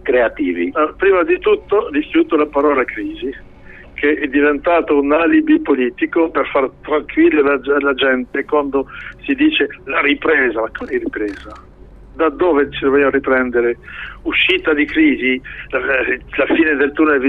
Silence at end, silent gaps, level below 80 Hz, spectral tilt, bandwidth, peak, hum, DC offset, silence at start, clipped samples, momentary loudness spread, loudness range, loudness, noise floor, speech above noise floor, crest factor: 0 s; none; -42 dBFS; -7 dB/octave; 4.6 kHz; -2 dBFS; none; under 0.1%; 0.05 s; under 0.1%; 9 LU; 3 LU; -15 LUFS; -35 dBFS; 20 dB; 12 dB